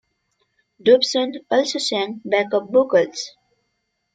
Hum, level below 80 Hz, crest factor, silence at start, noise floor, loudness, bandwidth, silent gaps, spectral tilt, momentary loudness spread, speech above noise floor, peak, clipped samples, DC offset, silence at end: none; -70 dBFS; 18 dB; 0.85 s; -73 dBFS; -19 LUFS; 9.4 kHz; none; -3 dB/octave; 9 LU; 54 dB; -2 dBFS; under 0.1%; under 0.1%; 0.85 s